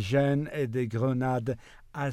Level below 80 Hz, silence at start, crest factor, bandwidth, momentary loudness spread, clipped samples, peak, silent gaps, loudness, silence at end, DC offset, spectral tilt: -56 dBFS; 0 s; 16 dB; 13 kHz; 11 LU; under 0.1%; -14 dBFS; none; -29 LUFS; 0 s; under 0.1%; -7.5 dB/octave